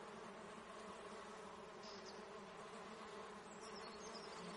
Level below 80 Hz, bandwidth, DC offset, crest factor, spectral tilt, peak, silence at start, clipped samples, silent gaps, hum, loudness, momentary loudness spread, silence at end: -80 dBFS; 11 kHz; under 0.1%; 14 dB; -3.5 dB/octave; -40 dBFS; 0 s; under 0.1%; none; none; -54 LUFS; 3 LU; 0 s